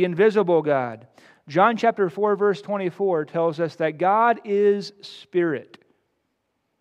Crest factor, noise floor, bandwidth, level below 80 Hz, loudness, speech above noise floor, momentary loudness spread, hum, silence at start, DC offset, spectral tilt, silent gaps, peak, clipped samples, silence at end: 18 dB; -74 dBFS; 8.6 kHz; -80 dBFS; -22 LUFS; 53 dB; 9 LU; none; 0 s; under 0.1%; -7 dB/octave; none; -4 dBFS; under 0.1%; 1.15 s